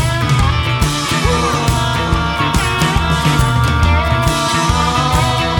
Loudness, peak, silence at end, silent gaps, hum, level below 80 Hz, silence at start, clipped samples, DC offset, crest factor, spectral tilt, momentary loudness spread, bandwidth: -14 LUFS; 0 dBFS; 0 s; none; none; -22 dBFS; 0 s; under 0.1%; under 0.1%; 14 dB; -4.5 dB/octave; 2 LU; 18.5 kHz